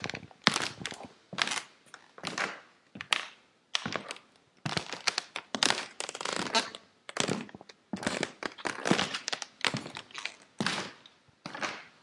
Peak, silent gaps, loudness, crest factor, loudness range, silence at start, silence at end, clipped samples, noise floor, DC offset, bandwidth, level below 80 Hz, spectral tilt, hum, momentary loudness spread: 0 dBFS; none; -33 LUFS; 36 dB; 3 LU; 0 s; 0.15 s; under 0.1%; -59 dBFS; under 0.1%; 11.5 kHz; -74 dBFS; -2.5 dB/octave; none; 17 LU